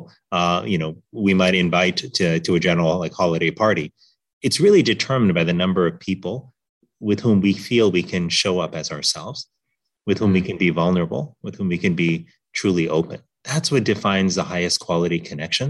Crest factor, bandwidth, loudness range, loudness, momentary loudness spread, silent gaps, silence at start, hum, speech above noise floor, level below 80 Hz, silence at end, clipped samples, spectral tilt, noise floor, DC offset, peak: 16 dB; 12 kHz; 3 LU; -20 LUFS; 11 LU; 4.33-4.41 s, 6.69-6.81 s; 0 s; none; 58 dB; -54 dBFS; 0 s; under 0.1%; -5 dB/octave; -78 dBFS; under 0.1%; -4 dBFS